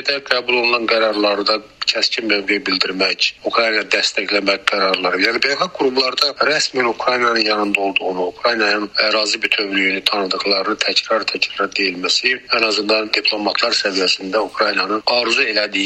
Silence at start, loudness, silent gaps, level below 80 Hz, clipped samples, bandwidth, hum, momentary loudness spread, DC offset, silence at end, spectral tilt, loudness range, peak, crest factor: 0 s; -16 LUFS; none; -60 dBFS; under 0.1%; 15 kHz; none; 3 LU; under 0.1%; 0 s; -2 dB/octave; 1 LU; 0 dBFS; 18 dB